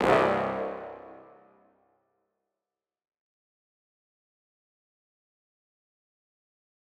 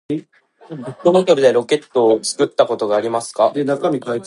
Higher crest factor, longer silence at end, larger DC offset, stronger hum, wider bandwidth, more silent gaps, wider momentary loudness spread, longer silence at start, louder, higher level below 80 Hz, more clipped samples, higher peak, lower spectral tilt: first, 28 dB vs 16 dB; first, 5.65 s vs 0 s; neither; neither; first, 14 kHz vs 11.5 kHz; neither; first, 23 LU vs 13 LU; about the same, 0 s vs 0.1 s; second, -28 LUFS vs -17 LUFS; about the same, -64 dBFS vs -68 dBFS; neither; second, -6 dBFS vs 0 dBFS; about the same, -6 dB/octave vs -5 dB/octave